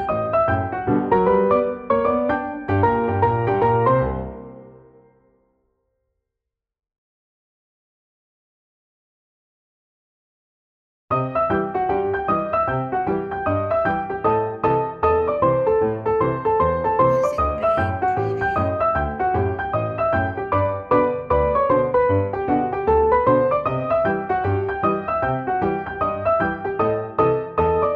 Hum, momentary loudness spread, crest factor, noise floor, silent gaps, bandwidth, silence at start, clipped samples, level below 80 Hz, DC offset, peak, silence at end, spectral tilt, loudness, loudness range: none; 5 LU; 16 dB; -84 dBFS; 6.98-11.08 s; 7.4 kHz; 0 s; under 0.1%; -40 dBFS; under 0.1%; -6 dBFS; 0 s; -9 dB/octave; -20 LUFS; 5 LU